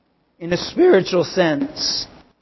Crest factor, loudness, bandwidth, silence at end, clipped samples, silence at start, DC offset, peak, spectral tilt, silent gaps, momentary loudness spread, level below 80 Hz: 16 dB; -18 LUFS; 6.2 kHz; 0.35 s; under 0.1%; 0.4 s; under 0.1%; -4 dBFS; -4.5 dB/octave; none; 11 LU; -52 dBFS